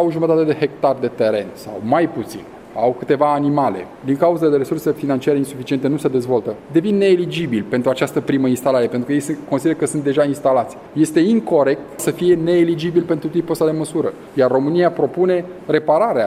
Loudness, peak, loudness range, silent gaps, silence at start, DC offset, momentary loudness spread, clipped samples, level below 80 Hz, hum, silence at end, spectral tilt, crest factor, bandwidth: -18 LUFS; -2 dBFS; 2 LU; none; 0 s; under 0.1%; 7 LU; under 0.1%; -58 dBFS; none; 0 s; -6.5 dB/octave; 16 dB; 15.5 kHz